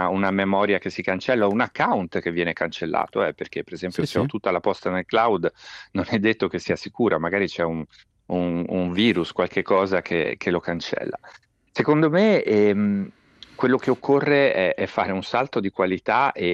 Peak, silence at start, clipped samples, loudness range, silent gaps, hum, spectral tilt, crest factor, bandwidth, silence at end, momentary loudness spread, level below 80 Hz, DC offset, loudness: -6 dBFS; 0 s; under 0.1%; 4 LU; none; none; -6.5 dB/octave; 16 dB; 11 kHz; 0 s; 10 LU; -62 dBFS; under 0.1%; -22 LUFS